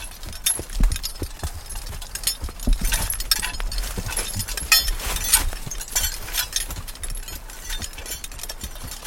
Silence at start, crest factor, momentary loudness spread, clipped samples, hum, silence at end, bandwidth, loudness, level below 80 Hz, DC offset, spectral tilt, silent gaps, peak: 0 s; 24 dB; 15 LU; under 0.1%; none; 0 s; 17 kHz; -24 LUFS; -28 dBFS; under 0.1%; -1 dB/octave; none; 0 dBFS